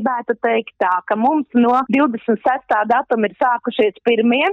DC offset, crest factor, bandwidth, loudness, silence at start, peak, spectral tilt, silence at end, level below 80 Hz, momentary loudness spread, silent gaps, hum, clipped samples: under 0.1%; 10 dB; 4.9 kHz; -17 LUFS; 0 s; -6 dBFS; -7 dB/octave; 0 s; -62 dBFS; 4 LU; none; none; under 0.1%